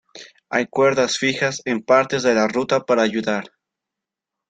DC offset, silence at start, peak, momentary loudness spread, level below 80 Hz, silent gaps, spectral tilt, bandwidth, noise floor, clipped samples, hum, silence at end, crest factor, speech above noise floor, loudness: under 0.1%; 0.15 s; 0 dBFS; 7 LU; -62 dBFS; none; -4 dB/octave; 9.2 kHz; -85 dBFS; under 0.1%; none; 1.05 s; 20 dB; 66 dB; -19 LUFS